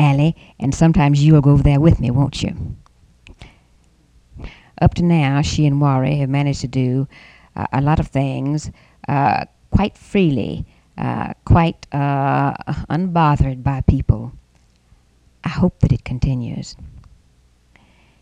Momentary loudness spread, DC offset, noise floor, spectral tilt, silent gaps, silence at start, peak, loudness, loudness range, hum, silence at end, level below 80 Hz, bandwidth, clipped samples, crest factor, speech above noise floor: 16 LU; under 0.1%; -55 dBFS; -7.5 dB/octave; none; 0 s; 0 dBFS; -18 LUFS; 6 LU; none; 1.2 s; -30 dBFS; 9 kHz; under 0.1%; 18 dB; 38 dB